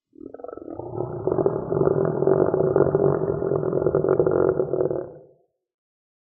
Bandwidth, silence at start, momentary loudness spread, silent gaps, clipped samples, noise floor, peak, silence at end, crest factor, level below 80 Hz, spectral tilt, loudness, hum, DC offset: 1.9 kHz; 0.25 s; 16 LU; none; under 0.1%; -58 dBFS; -4 dBFS; 1.15 s; 20 dB; -52 dBFS; -14 dB/octave; -22 LUFS; none; under 0.1%